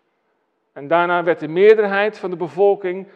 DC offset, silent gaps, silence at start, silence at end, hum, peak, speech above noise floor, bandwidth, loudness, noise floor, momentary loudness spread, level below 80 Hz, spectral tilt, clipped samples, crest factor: under 0.1%; none; 0.75 s; 0.1 s; none; 0 dBFS; 51 dB; 5.6 kHz; -17 LUFS; -68 dBFS; 12 LU; -80 dBFS; -7 dB/octave; under 0.1%; 18 dB